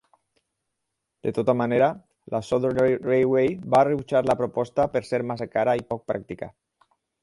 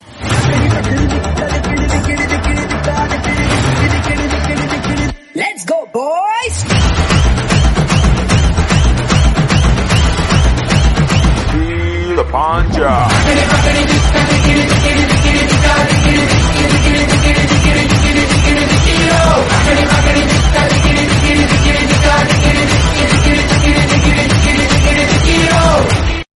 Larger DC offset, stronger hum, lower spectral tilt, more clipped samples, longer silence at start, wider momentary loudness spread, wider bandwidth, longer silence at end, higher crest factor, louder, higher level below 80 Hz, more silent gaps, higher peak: neither; neither; first, -7.5 dB/octave vs -5 dB/octave; neither; first, 1.25 s vs 0.1 s; first, 11 LU vs 6 LU; about the same, 11.5 kHz vs 12 kHz; first, 0.75 s vs 0.15 s; first, 18 dB vs 10 dB; second, -24 LUFS vs -11 LUFS; second, -58 dBFS vs -16 dBFS; neither; second, -6 dBFS vs 0 dBFS